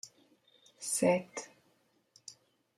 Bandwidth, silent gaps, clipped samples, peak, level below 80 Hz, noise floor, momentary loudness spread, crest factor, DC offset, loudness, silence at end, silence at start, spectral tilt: 14.5 kHz; none; under 0.1%; -16 dBFS; -80 dBFS; -72 dBFS; 23 LU; 22 dB; under 0.1%; -33 LUFS; 0.45 s; 0.05 s; -4 dB/octave